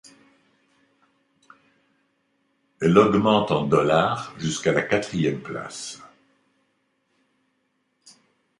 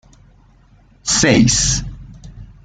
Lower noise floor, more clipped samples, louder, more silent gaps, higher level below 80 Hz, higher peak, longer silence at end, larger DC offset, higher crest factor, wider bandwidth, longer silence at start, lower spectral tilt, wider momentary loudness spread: first, -72 dBFS vs -49 dBFS; neither; second, -22 LUFS vs -14 LUFS; neither; second, -56 dBFS vs -34 dBFS; about the same, -2 dBFS vs -2 dBFS; first, 2.55 s vs 0.2 s; neither; about the same, 22 dB vs 18 dB; first, 11.5 kHz vs 9.6 kHz; first, 2.8 s vs 1.05 s; first, -5.5 dB/octave vs -3.5 dB/octave; about the same, 16 LU vs 14 LU